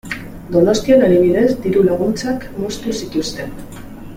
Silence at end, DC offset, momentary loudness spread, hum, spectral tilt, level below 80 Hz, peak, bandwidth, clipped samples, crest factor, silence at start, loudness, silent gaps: 0 s; under 0.1%; 17 LU; none; -6 dB/octave; -40 dBFS; -2 dBFS; 16.5 kHz; under 0.1%; 14 dB; 0.05 s; -16 LUFS; none